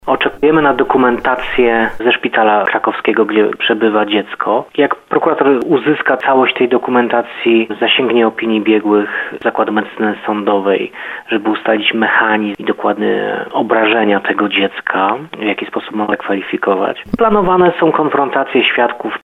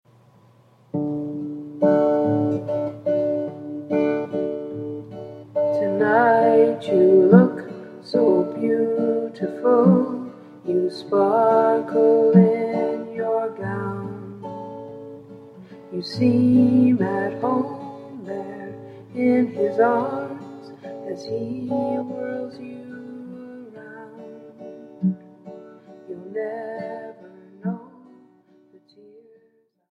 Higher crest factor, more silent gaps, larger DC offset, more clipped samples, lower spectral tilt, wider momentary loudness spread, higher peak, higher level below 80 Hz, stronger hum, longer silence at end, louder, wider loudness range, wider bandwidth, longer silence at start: second, 14 dB vs 22 dB; neither; neither; neither; second, -7 dB/octave vs -9 dB/octave; second, 6 LU vs 22 LU; about the same, 0 dBFS vs 0 dBFS; first, -46 dBFS vs -66 dBFS; neither; second, 0.05 s vs 2.05 s; first, -13 LUFS vs -21 LUFS; second, 3 LU vs 16 LU; second, 5.2 kHz vs 6.4 kHz; second, 0.05 s vs 0.95 s